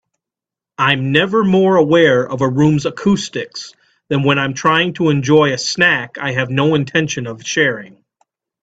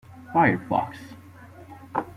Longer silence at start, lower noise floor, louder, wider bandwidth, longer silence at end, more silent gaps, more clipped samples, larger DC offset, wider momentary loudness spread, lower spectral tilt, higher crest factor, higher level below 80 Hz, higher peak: first, 0.8 s vs 0.1 s; first, -87 dBFS vs -46 dBFS; first, -15 LUFS vs -24 LUFS; second, 8 kHz vs 14.5 kHz; first, 0.75 s vs 0.05 s; neither; neither; neither; second, 10 LU vs 24 LU; second, -5 dB/octave vs -8 dB/octave; second, 16 dB vs 22 dB; first, -52 dBFS vs -60 dBFS; first, 0 dBFS vs -6 dBFS